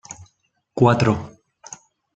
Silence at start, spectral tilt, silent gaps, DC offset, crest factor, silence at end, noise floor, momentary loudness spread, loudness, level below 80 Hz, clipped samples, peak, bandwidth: 0.1 s; -6.5 dB/octave; none; under 0.1%; 20 dB; 0.4 s; -67 dBFS; 24 LU; -19 LUFS; -54 dBFS; under 0.1%; -2 dBFS; 8.2 kHz